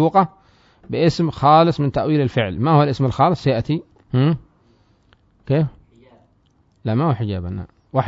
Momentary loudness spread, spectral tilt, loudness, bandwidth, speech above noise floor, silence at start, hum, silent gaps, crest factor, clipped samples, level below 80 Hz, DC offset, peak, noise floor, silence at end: 12 LU; -8 dB/octave; -19 LUFS; 7.8 kHz; 42 dB; 0 s; none; none; 18 dB; under 0.1%; -46 dBFS; under 0.1%; -2 dBFS; -59 dBFS; 0 s